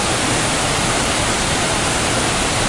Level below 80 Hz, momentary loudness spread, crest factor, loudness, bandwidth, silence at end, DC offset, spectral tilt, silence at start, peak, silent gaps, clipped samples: -32 dBFS; 0 LU; 12 dB; -16 LUFS; 12 kHz; 0 s; under 0.1%; -2.5 dB/octave; 0 s; -6 dBFS; none; under 0.1%